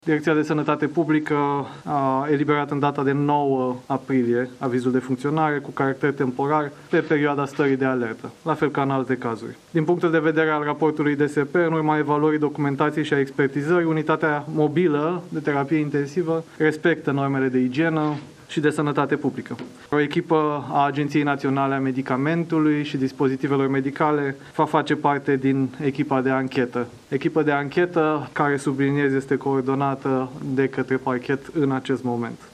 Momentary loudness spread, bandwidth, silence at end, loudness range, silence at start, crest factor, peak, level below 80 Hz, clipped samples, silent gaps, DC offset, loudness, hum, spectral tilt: 5 LU; 11 kHz; 0.05 s; 2 LU; 0.05 s; 18 dB; -4 dBFS; -64 dBFS; under 0.1%; none; under 0.1%; -22 LUFS; none; -7.5 dB/octave